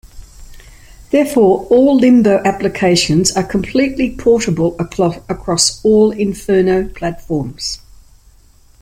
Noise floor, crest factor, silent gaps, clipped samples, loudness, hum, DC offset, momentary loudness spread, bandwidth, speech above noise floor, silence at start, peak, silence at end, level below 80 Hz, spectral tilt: -46 dBFS; 14 dB; none; under 0.1%; -14 LUFS; none; under 0.1%; 11 LU; 16 kHz; 33 dB; 0.15 s; 0 dBFS; 1.05 s; -38 dBFS; -4.5 dB/octave